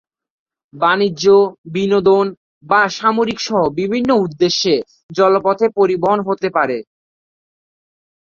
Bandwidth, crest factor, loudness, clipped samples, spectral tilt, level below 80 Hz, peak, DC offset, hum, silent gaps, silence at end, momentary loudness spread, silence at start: 7.2 kHz; 14 dB; -15 LUFS; under 0.1%; -5 dB/octave; -56 dBFS; -2 dBFS; under 0.1%; none; 1.58-1.64 s, 2.37-2.61 s, 5.03-5.09 s; 1.5 s; 6 LU; 0.75 s